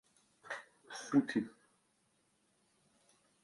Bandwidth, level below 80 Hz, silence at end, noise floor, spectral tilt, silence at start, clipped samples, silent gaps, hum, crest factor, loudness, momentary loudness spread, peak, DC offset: 11.5 kHz; -84 dBFS; 1.9 s; -77 dBFS; -5.5 dB/octave; 0.45 s; under 0.1%; none; none; 22 dB; -38 LUFS; 16 LU; -18 dBFS; under 0.1%